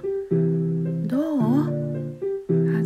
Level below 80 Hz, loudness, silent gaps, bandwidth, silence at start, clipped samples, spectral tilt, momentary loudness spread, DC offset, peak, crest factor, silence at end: -60 dBFS; -24 LUFS; none; 4.6 kHz; 0 s; under 0.1%; -10.5 dB/octave; 8 LU; under 0.1%; -10 dBFS; 14 dB; 0 s